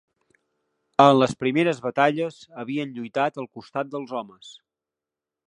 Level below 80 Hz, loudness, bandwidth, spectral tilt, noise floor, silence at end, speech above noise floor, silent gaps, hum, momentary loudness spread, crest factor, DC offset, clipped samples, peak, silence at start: -68 dBFS; -23 LUFS; 10.5 kHz; -6 dB/octave; -88 dBFS; 0.95 s; 65 dB; none; none; 17 LU; 24 dB; under 0.1%; under 0.1%; 0 dBFS; 1 s